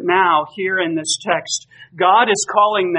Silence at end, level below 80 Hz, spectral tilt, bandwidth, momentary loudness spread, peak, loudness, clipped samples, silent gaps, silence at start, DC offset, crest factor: 0 s; -70 dBFS; -2.5 dB/octave; 10 kHz; 7 LU; 0 dBFS; -16 LUFS; under 0.1%; none; 0 s; under 0.1%; 16 dB